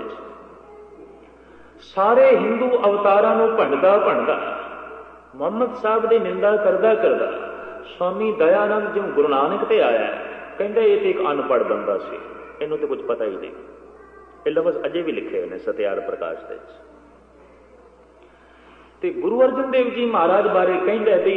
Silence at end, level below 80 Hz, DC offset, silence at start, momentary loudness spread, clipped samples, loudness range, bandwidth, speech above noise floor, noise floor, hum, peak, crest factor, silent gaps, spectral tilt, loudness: 0 s; -60 dBFS; under 0.1%; 0 s; 17 LU; under 0.1%; 9 LU; 5.2 kHz; 31 dB; -49 dBFS; none; -4 dBFS; 16 dB; none; -7.5 dB/octave; -20 LUFS